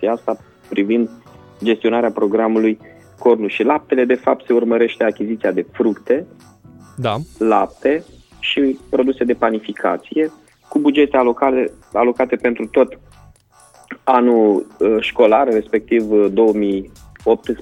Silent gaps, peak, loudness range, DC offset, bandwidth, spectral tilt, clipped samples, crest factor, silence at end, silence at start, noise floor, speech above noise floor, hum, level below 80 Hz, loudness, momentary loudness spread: none; 0 dBFS; 4 LU; under 0.1%; 10.5 kHz; -6.5 dB/octave; under 0.1%; 16 dB; 0 s; 0 s; -49 dBFS; 33 dB; none; -52 dBFS; -17 LUFS; 9 LU